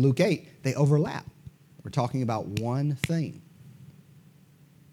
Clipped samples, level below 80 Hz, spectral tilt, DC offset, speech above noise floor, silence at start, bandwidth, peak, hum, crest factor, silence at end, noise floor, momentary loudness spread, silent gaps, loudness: under 0.1%; -62 dBFS; -7 dB/octave; under 0.1%; 30 dB; 0 s; 14.5 kHz; -10 dBFS; none; 18 dB; 1.05 s; -56 dBFS; 15 LU; none; -28 LUFS